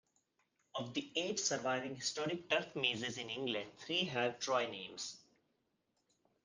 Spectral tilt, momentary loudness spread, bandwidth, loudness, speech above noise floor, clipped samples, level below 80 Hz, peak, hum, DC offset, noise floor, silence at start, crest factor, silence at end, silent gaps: -2.5 dB/octave; 9 LU; 10 kHz; -38 LUFS; 43 dB; under 0.1%; -82 dBFS; -20 dBFS; none; under 0.1%; -82 dBFS; 0.75 s; 22 dB; 1.25 s; none